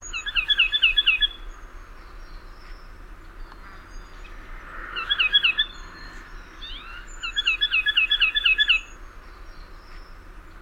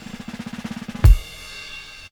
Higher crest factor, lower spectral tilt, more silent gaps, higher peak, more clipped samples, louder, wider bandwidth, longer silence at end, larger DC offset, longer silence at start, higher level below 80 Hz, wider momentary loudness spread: about the same, 20 dB vs 20 dB; second, 0 dB/octave vs -6 dB/octave; neither; second, -8 dBFS vs 0 dBFS; neither; about the same, -20 LUFS vs -21 LUFS; about the same, 16 kHz vs 17.5 kHz; second, 0 s vs 0.3 s; neither; second, 0 s vs 0.15 s; second, -40 dBFS vs -22 dBFS; first, 24 LU vs 18 LU